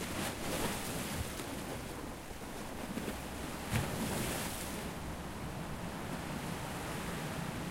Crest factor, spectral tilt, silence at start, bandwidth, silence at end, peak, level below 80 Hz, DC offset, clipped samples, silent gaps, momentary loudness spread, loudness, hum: 24 dB; -4 dB/octave; 0 s; 16 kHz; 0 s; -16 dBFS; -50 dBFS; under 0.1%; under 0.1%; none; 7 LU; -40 LUFS; none